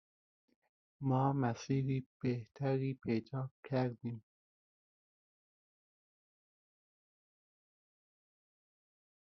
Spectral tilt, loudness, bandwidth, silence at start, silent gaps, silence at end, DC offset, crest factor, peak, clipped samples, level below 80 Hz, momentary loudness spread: -8 dB/octave; -38 LUFS; 6.4 kHz; 1 s; 2.06-2.20 s, 3.51-3.63 s; 5.15 s; under 0.1%; 20 dB; -22 dBFS; under 0.1%; -76 dBFS; 10 LU